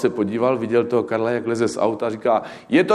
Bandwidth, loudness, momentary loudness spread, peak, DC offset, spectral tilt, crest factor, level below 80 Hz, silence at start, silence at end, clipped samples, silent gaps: 11.5 kHz; -21 LUFS; 3 LU; -2 dBFS; under 0.1%; -6 dB/octave; 16 dB; -64 dBFS; 0 s; 0 s; under 0.1%; none